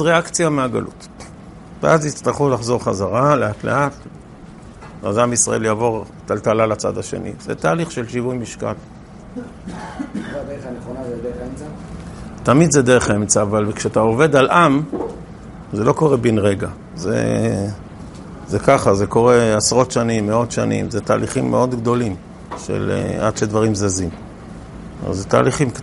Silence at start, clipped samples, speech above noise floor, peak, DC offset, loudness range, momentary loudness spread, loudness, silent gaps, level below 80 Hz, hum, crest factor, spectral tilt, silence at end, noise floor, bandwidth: 0 s; under 0.1%; 21 dB; 0 dBFS; under 0.1%; 9 LU; 20 LU; -18 LUFS; none; -42 dBFS; none; 18 dB; -5 dB/octave; 0 s; -38 dBFS; 11.5 kHz